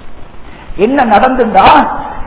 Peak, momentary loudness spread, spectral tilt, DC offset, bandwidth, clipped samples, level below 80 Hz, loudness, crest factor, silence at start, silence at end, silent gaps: 0 dBFS; 10 LU; -9 dB/octave; under 0.1%; 4 kHz; 4%; -30 dBFS; -8 LUFS; 10 dB; 0 s; 0 s; none